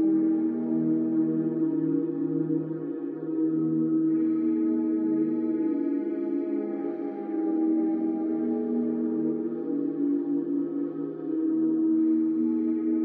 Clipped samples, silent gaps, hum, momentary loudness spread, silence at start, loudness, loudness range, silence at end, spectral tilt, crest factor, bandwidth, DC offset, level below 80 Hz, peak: under 0.1%; none; none; 7 LU; 0 s; -27 LUFS; 2 LU; 0 s; -11 dB/octave; 10 dB; 2.5 kHz; under 0.1%; -88 dBFS; -16 dBFS